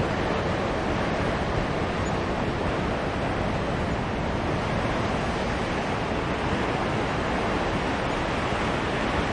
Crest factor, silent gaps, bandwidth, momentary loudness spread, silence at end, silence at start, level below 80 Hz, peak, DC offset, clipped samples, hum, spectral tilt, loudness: 14 dB; none; 11 kHz; 1 LU; 0 s; 0 s; -38 dBFS; -12 dBFS; under 0.1%; under 0.1%; none; -6 dB/octave; -27 LUFS